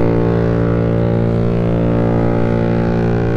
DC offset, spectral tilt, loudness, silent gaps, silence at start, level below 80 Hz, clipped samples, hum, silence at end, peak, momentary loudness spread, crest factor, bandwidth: under 0.1%; -10 dB/octave; -15 LUFS; none; 0 s; -28 dBFS; under 0.1%; none; 0 s; -2 dBFS; 1 LU; 12 dB; 6 kHz